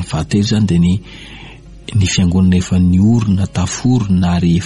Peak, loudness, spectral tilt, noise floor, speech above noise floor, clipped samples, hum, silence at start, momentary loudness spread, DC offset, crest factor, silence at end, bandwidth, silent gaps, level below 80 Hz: -4 dBFS; -14 LUFS; -6 dB/octave; -35 dBFS; 22 dB; under 0.1%; none; 0 s; 19 LU; under 0.1%; 10 dB; 0 s; 11.5 kHz; none; -32 dBFS